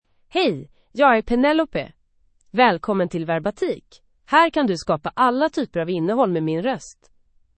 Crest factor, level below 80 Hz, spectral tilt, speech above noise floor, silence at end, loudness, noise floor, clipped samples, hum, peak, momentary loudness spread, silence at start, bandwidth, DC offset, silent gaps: 20 dB; -50 dBFS; -6 dB/octave; 40 dB; 0.65 s; -21 LUFS; -60 dBFS; under 0.1%; none; -2 dBFS; 11 LU; 0.35 s; 8.8 kHz; under 0.1%; none